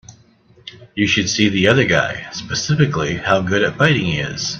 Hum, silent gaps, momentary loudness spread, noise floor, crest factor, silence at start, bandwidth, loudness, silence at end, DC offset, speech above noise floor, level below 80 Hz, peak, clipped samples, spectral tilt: none; none; 9 LU; -51 dBFS; 18 dB; 0.1 s; 8.2 kHz; -16 LUFS; 0 s; under 0.1%; 34 dB; -46 dBFS; 0 dBFS; under 0.1%; -4.5 dB/octave